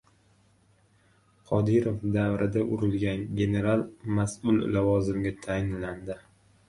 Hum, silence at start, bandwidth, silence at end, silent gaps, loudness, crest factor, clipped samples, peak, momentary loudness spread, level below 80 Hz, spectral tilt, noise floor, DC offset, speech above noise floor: none; 1.5 s; 11.5 kHz; 0.5 s; none; -28 LUFS; 18 dB; under 0.1%; -10 dBFS; 8 LU; -50 dBFS; -7.5 dB/octave; -63 dBFS; under 0.1%; 37 dB